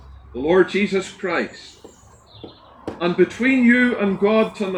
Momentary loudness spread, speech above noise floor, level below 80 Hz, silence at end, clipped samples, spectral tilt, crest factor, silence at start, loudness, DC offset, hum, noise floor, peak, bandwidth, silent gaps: 18 LU; 29 dB; -50 dBFS; 0 s; under 0.1%; -6 dB/octave; 18 dB; 0.1 s; -18 LUFS; under 0.1%; none; -48 dBFS; -2 dBFS; 10 kHz; none